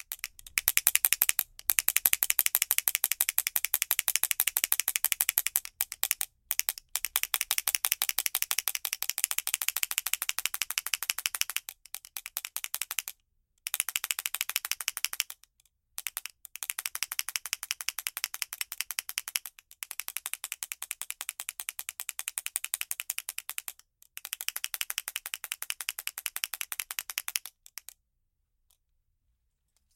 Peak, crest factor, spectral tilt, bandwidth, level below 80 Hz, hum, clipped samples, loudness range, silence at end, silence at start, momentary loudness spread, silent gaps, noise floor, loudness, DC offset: 0 dBFS; 34 dB; 4 dB/octave; 17 kHz; -68 dBFS; none; under 0.1%; 10 LU; 2.45 s; 0.1 s; 13 LU; none; -78 dBFS; -30 LUFS; under 0.1%